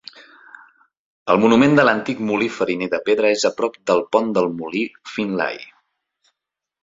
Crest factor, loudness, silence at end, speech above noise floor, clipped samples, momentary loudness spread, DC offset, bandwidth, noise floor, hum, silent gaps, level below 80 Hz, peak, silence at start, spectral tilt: 18 dB; -19 LUFS; 1.2 s; 65 dB; under 0.1%; 12 LU; under 0.1%; 7.8 kHz; -83 dBFS; none; 0.97-1.26 s; -60 dBFS; -2 dBFS; 0.15 s; -5 dB/octave